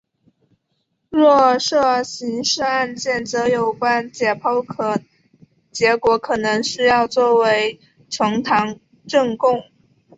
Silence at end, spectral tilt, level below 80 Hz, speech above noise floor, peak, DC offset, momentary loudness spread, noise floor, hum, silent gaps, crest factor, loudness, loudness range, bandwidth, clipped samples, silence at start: 0.55 s; -3.5 dB/octave; -58 dBFS; 53 dB; -2 dBFS; under 0.1%; 9 LU; -71 dBFS; none; none; 16 dB; -18 LUFS; 3 LU; 8 kHz; under 0.1%; 1.1 s